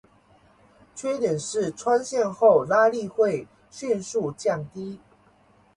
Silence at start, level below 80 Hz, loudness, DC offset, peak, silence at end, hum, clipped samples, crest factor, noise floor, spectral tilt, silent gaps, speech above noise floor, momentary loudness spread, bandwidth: 0.95 s; -66 dBFS; -24 LUFS; under 0.1%; -6 dBFS; 0.8 s; none; under 0.1%; 18 dB; -59 dBFS; -5 dB/octave; none; 35 dB; 18 LU; 11.5 kHz